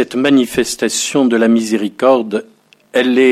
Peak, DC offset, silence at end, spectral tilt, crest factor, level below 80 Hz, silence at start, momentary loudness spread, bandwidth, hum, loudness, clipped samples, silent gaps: 0 dBFS; under 0.1%; 0 s; -3.5 dB/octave; 14 dB; -52 dBFS; 0 s; 7 LU; 15.5 kHz; none; -14 LUFS; under 0.1%; none